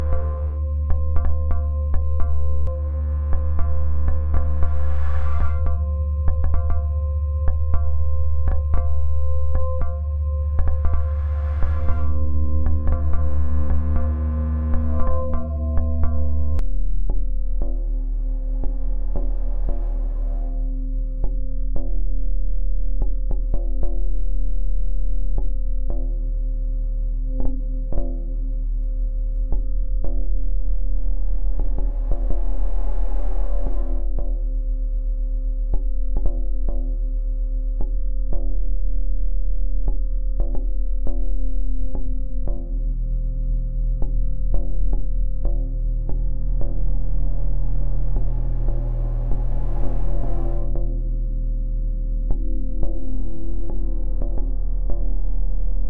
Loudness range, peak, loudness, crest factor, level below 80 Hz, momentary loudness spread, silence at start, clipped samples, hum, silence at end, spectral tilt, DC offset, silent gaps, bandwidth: 5 LU; -4 dBFS; -26 LUFS; 14 dB; -22 dBFS; 5 LU; 0 s; under 0.1%; none; 0 s; -11.5 dB/octave; under 0.1%; none; 2.2 kHz